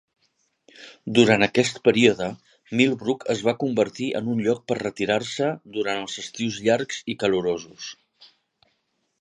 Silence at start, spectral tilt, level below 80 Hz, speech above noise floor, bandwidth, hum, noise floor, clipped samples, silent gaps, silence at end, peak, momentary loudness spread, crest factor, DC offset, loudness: 0.8 s; -4.5 dB/octave; -62 dBFS; 50 dB; 11 kHz; none; -73 dBFS; under 0.1%; none; 0.95 s; -2 dBFS; 12 LU; 22 dB; under 0.1%; -23 LUFS